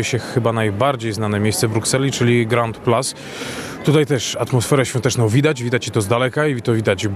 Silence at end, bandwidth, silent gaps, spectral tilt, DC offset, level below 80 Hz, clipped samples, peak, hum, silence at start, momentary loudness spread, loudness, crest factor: 0 s; 14 kHz; none; -5 dB/octave; under 0.1%; -54 dBFS; under 0.1%; -2 dBFS; none; 0 s; 5 LU; -18 LUFS; 16 dB